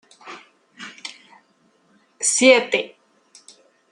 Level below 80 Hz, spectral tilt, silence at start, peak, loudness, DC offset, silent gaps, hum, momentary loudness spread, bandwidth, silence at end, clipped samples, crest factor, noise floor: -78 dBFS; -0.5 dB/octave; 0.25 s; -2 dBFS; -17 LUFS; under 0.1%; none; none; 26 LU; 12 kHz; 1.05 s; under 0.1%; 22 dB; -61 dBFS